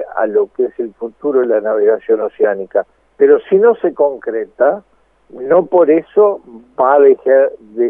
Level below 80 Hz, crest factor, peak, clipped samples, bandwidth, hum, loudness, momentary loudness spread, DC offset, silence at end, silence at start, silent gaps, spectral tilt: -62 dBFS; 14 dB; 0 dBFS; under 0.1%; 3.5 kHz; none; -13 LUFS; 12 LU; under 0.1%; 0 s; 0 s; none; -10 dB/octave